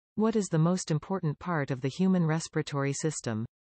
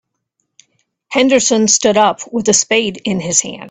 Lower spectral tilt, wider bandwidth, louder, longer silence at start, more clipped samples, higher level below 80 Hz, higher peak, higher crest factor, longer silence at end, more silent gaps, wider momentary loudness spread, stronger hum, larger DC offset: first, -6 dB/octave vs -2.5 dB/octave; about the same, 8.8 kHz vs 9.6 kHz; second, -30 LUFS vs -13 LUFS; second, 0.15 s vs 1.1 s; neither; second, -66 dBFS vs -56 dBFS; second, -16 dBFS vs 0 dBFS; about the same, 14 dB vs 16 dB; first, 0.3 s vs 0 s; neither; about the same, 6 LU vs 8 LU; neither; neither